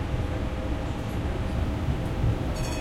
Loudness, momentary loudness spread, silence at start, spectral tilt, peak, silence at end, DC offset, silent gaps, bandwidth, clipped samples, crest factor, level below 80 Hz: -30 LUFS; 3 LU; 0 s; -6.5 dB/octave; -14 dBFS; 0 s; under 0.1%; none; 14.5 kHz; under 0.1%; 12 dB; -32 dBFS